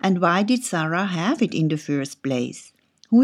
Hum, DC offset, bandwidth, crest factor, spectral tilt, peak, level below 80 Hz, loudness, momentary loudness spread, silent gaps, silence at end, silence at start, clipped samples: none; under 0.1%; 13.5 kHz; 16 dB; -5.5 dB/octave; -6 dBFS; -78 dBFS; -22 LUFS; 8 LU; none; 0 s; 0.05 s; under 0.1%